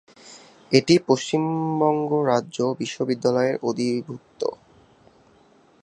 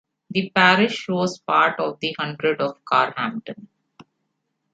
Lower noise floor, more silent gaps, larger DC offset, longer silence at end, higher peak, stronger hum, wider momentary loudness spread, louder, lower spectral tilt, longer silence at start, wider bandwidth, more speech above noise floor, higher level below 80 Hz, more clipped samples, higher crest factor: second, -56 dBFS vs -75 dBFS; neither; neither; first, 1.3 s vs 1.1 s; about the same, 0 dBFS vs -2 dBFS; neither; about the same, 11 LU vs 12 LU; about the same, -22 LUFS vs -20 LUFS; about the same, -5.5 dB/octave vs -5 dB/octave; about the same, 0.25 s vs 0.3 s; first, 10.5 kHz vs 9 kHz; second, 34 dB vs 54 dB; about the same, -66 dBFS vs -68 dBFS; neither; about the same, 22 dB vs 20 dB